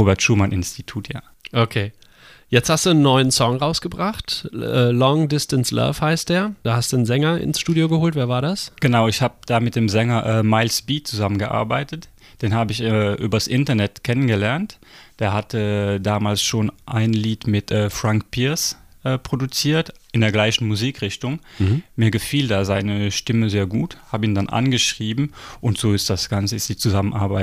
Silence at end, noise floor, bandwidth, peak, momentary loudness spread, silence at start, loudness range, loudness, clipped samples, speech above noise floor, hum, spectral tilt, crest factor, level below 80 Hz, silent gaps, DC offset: 0 s; -48 dBFS; 15.5 kHz; -2 dBFS; 8 LU; 0 s; 2 LU; -20 LUFS; under 0.1%; 28 dB; none; -5 dB/octave; 18 dB; -46 dBFS; none; under 0.1%